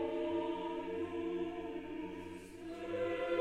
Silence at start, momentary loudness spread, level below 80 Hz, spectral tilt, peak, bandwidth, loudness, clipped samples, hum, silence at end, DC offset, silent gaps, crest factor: 0 s; 10 LU; -64 dBFS; -6.5 dB/octave; -24 dBFS; 11.5 kHz; -41 LUFS; under 0.1%; none; 0 s; under 0.1%; none; 16 dB